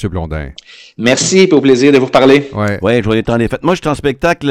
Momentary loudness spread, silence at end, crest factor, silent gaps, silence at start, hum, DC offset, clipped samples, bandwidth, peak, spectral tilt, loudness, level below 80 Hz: 11 LU; 0 s; 12 dB; none; 0 s; none; under 0.1%; 0.3%; 12.5 kHz; 0 dBFS; -5 dB/octave; -11 LUFS; -34 dBFS